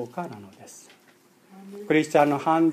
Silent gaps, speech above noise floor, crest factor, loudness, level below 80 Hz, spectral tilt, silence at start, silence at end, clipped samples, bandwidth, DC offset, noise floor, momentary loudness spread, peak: none; 33 dB; 20 dB; -23 LUFS; -78 dBFS; -6 dB/octave; 0 s; 0 s; under 0.1%; 14.5 kHz; under 0.1%; -58 dBFS; 24 LU; -6 dBFS